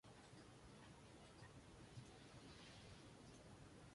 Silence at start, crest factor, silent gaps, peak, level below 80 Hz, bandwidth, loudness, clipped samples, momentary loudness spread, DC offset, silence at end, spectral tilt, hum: 0.05 s; 18 dB; none; -46 dBFS; -74 dBFS; 11.5 kHz; -63 LUFS; under 0.1%; 3 LU; under 0.1%; 0 s; -4.5 dB/octave; none